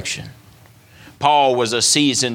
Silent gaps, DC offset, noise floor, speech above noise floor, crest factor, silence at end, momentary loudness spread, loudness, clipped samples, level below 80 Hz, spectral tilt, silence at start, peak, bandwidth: none; under 0.1%; -47 dBFS; 30 dB; 18 dB; 0 s; 11 LU; -15 LUFS; under 0.1%; -58 dBFS; -2.5 dB/octave; 0 s; -2 dBFS; 18 kHz